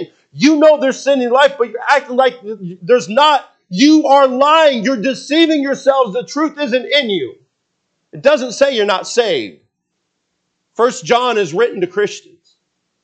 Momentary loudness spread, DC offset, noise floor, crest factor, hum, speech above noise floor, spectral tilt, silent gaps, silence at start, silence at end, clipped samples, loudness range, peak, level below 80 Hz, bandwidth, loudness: 11 LU; under 0.1%; -71 dBFS; 14 dB; none; 58 dB; -4 dB/octave; none; 0 s; 0.85 s; under 0.1%; 6 LU; 0 dBFS; -68 dBFS; 8.8 kHz; -13 LUFS